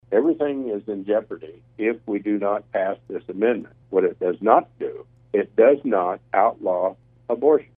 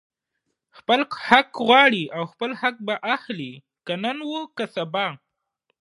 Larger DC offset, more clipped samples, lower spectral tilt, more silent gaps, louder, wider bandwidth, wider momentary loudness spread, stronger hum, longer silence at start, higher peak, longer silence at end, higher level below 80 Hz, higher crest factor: neither; neither; first, -10 dB/octave vs -5 dB/octave; neither; about the same, -22 LUFS vs -21 LUFS; second, 3.7 kHz vs 11.5 kHz; about the same, 14 LU vs 16 LU; neither; second, 0.1 s vs 0.9 s; about the same, 0 dBFS vs 0 dBFS; second, 0.15 s vs 0.65 s; about the same, -66 dBFS vs -70 dBFS; about the same, 22 dB vs 24 dB